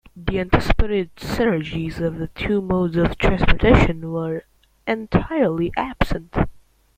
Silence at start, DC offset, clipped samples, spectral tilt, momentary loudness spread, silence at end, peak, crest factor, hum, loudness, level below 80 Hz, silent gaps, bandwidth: 0.15 s; under 0.1%; under 0.1%; -7.5 dB/octave; 10 LU; 0.4 s; -2 dBFS; 18 dB; none; -21 LUFS; -28 dBFS; none; 15.5 kHz